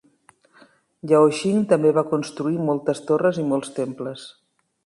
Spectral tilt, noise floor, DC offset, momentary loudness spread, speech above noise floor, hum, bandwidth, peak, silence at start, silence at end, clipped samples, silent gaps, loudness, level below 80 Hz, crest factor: -6.5 dB/octave; -57 dBFS; under 0.1%; 15 LU; 37 dB; none; 11.5 kHz; -4 dBFS; 1.05 s; 0.55 s; under 0.1%; none; -21 LUFS; -68 dBFS; 18 dB